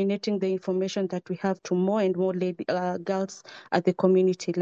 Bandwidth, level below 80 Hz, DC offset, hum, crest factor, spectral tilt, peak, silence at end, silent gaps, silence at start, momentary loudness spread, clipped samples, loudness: 7.6 kHz; -74 dBFS; under 0.1%; none; 16 dB; -6.5 dB/octave; -10 dBFS; 0 s; none; 0 s; 8 LU; under 0.1%; -26 LUFS